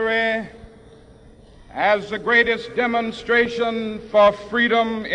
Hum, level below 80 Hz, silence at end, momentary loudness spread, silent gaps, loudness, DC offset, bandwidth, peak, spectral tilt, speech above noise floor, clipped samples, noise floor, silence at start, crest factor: none; -50 dBFS; 0 s; 9 LU; none; -19 LUFS; under 0.1%; 10 kHz; -4 dBFS; -5 dB/octave; 27 dB; under 0.1%; -47 dBFS; 0 s; 18 dB